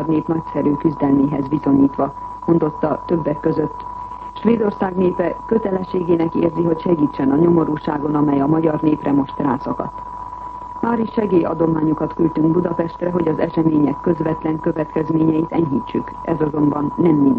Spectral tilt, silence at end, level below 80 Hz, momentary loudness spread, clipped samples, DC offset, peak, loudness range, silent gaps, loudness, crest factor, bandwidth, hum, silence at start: -10.5 dB/octave; 0 s; -44 dBFS; 8 LU; under 0.1%; under 0.1%; -2 dBFS; 3 LU; none; -18 LUFS; 14 dB; 5 kHz; none; 0 s